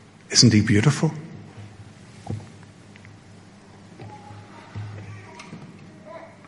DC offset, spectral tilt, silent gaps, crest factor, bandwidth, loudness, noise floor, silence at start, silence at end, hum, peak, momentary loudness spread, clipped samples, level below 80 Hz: under 0.1%; -4.5 dB/octave; none; 24 dB; 11.5 kHz; -18 LUFS; -47 dBFS; 0.3 s; 0.25 s; none; -2 dBFS; 28 LU; under 0.1%; -58 dBFS